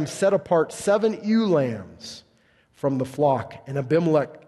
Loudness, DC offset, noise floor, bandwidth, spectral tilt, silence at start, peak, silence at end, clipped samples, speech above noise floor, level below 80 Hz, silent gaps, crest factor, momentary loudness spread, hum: -23 LUFS; under 0.1%; -61 dBFS; 12.5 kHz; -6.5 dB/octave; 0 s; -8 dBFS; 0.1 s; under 0.1%; 38 dB; -62 dBFS; none; 16 dB; 16 LU; none